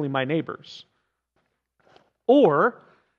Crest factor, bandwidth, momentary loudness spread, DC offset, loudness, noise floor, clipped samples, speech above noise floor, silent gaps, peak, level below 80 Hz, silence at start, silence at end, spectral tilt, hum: 18 dB; 7 kHz; 20 LU; under 0.1%; -21 LUFS; -74 dBFS; under 0.1%; 52 dB; none; -6 dBFS; -80 dBFS; 0 s; 0.5 s; -8 dB/octave; none